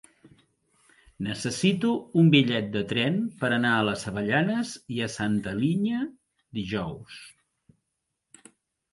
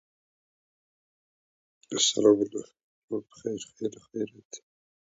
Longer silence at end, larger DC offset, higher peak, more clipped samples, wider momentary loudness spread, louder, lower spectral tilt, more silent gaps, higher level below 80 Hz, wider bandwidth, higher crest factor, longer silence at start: first, 1.65 s vs 0.55 s; neither; about the same, -6 dBFS vs -8 dBFS; neither; second, 14 LU vs 20 LU; about the same, -26 LUFS vs -28 LUFS; first, -5.5 dB/octave vs -3 dB/octave; second, none vs 2.84-3.08 s, 4.45-4.50 s; first, -60 dBFS vs -76 dBFS; first, 11.5 kHz vs 8 kHz; about the same, 22 dB vs 24 dB; second, 1.2 s vs 1.9 s